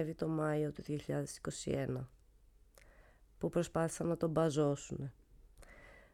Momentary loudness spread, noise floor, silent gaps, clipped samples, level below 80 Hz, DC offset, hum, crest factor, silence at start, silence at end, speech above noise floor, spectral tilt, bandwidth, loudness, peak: 15 LU; -65 dBFS; none; under 0.1%; -62 dBFS; under 0.1%; none; 18 dB; 0 s; 0.15 s; 28 dB; -6.5 dB/octave; 14 kHz; -37 LUFS; -20 dBFS